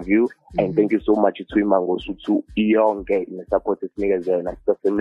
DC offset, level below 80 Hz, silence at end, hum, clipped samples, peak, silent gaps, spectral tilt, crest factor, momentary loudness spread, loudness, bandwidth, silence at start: under 0.1%; -48 dBFS; 0 s; none; under 0.1%; -4 dBFS; none; -8.5 dB/octave; 16 dB; 6 LU; -21 LUFS; 5.2 kHz; 0 s